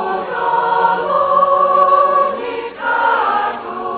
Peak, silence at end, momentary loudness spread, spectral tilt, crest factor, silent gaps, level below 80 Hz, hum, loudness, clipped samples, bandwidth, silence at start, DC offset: 0 dBFS; 0 s; 10 LU; -7.5 dB/octave; 14 dB; none; -56 dBFS; none; -15 LUFS; under 0.1%; 4.7 kHz; 0 s; under 0.1%